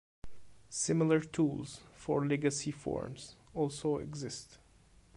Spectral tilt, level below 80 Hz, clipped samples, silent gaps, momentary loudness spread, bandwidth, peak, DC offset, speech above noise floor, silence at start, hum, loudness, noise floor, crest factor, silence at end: -5.5 dB/octave; -62 dBFS; under 0.1%; none; 15 LU; 11.5 kHz; -18 dBFS; under 0.1%; 29 dB; 0.25 s; none; -35 LUFS; -63 dBFS; 18 dB; 0.6 s